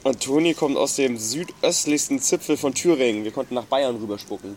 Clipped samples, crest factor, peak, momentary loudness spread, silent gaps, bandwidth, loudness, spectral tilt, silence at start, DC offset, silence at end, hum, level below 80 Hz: under 0.1%; 16 dB; -6 dBFS; 8 LU; none; 16.5 kHz; -22 LUFS; -3 dB/octave; 0.05 s; under 0.1%; 0 s; none; -62 dBFS